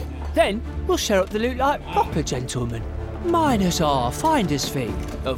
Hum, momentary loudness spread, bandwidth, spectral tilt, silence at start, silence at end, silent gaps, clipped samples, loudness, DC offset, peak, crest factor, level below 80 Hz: none; 8 LU; 16.5 kHz; -5 dB/octave; 0 s; 0 s; none; under 0.1%; -22 LUFS; under 0.1%; -6 dBFS; 16 dB; -34 dBFS